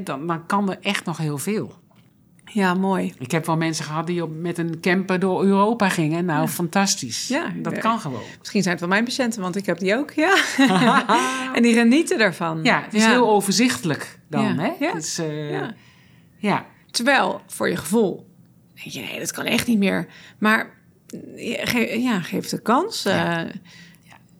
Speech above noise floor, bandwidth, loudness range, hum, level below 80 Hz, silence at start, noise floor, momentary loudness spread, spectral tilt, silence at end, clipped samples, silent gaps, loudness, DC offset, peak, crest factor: 33 dB; over 20 kHz; 6 LU; none; -66 dBFS; 0 s; -54 dBFS; 11 LU; -4.5 dB/octave; 0.55 s; under 0.1%; none; -21 LUFS; under 0.1%; -2 dBFS; 18 dB